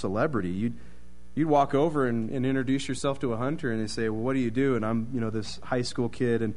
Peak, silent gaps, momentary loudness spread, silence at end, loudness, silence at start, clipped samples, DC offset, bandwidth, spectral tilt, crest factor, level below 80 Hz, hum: -10 dBFS; none; 7 LU; 0 s; -28 LUFS; 0 s; under 0.1%; 2%; 10.5 kHz; -6.5 dB/octave; 18 dB; -52 dBFS; none